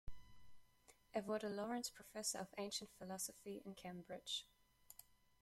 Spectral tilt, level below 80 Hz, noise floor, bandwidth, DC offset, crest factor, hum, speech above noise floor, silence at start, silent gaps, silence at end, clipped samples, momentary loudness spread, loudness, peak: -3 dB/octave; -68 dBFS; -72 dBFS; 16.5 kHz; under 0.1%; 22 dB; none; 24 dB; 0.05 s; none; 0.25 s; under 0.1%; 18 LU; -47 LUFS; -28 dBFS